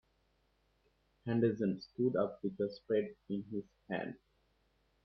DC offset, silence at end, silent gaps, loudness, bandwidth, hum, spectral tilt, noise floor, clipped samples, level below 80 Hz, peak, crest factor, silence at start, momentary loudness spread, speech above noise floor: under 0.1%; 0.9 s; none; -37 LUFS; 6.2 kHz; none; -9.5 dB/octave; -76 dBFS; under 0.1%; -74 dBFS; -18 dBFS; 20 dB; 1.25 s; 12 LU; 39 dB